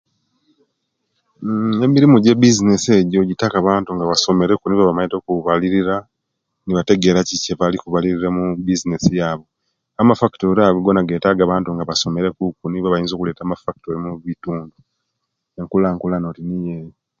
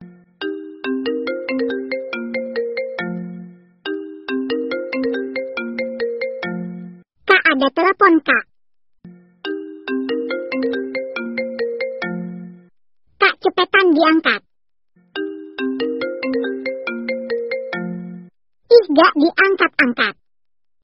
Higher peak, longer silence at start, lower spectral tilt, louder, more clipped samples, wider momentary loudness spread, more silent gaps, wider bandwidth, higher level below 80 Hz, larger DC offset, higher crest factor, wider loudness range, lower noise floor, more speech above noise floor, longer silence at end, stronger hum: about the same, 0 dBFS vs 0 dBFS; first, 1.4 s vs 0 s; first, -5.5 dB/octave vs -2 dB/octave; about the same, -17 LUFS vs -19 LUFS; neither; about the same, 13 LU vs 15 LU; neither; first, 7.6 kHz vs 5.8 kHz; first, -46 dBFS vs -64 dBFS; neither; about the same, 18 dB vs 20 dB; about the same, 9 LU vs 8 LU; second, -76 dBFS vs -90 dBFS; second, 59 dB vs 75 dB; second, 0.3 s vs 0.7 s; neither